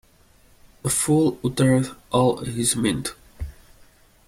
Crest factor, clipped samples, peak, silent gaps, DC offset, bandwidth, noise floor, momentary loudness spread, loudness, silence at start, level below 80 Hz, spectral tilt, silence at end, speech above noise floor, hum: 16 dB; under 0.1%; -6 dBFS; none; under 0.1%; 16 kHz; -55 dBFS; 18 LU; -22 LUFS; 0.85 s; -46 dBFS; -5 dB/octave; 0.75 s; 34 dB; none